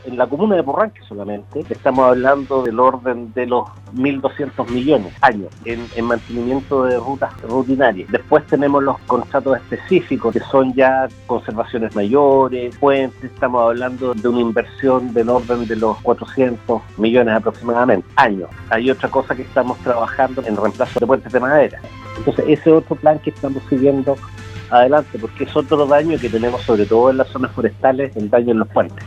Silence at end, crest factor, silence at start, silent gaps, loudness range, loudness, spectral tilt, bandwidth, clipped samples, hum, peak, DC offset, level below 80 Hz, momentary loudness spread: 0 s; 16 dB; 0.05 s; none; 2 LU; -17 LUFS; -7.5 dB/octave; 8.8 kHz; under 0.1%; none; 0 dBFS; under 0.1%; -46 dBFS; 9 LU